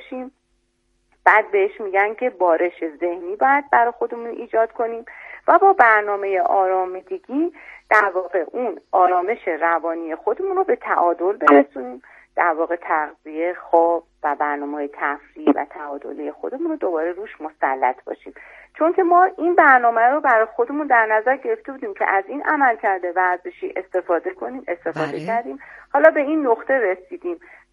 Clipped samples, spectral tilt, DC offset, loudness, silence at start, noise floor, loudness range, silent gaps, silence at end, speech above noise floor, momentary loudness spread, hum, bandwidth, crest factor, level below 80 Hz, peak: under 0.1%; -6.5 dB/octave; under 0.1%; -19 LUFS; 0 s; -67 dBFS; 7 LU; none; 0.35 s; 48 dB; 15 LU; none; 7.2 kHz; 20 dB; -66 dBFS; 0 dBFS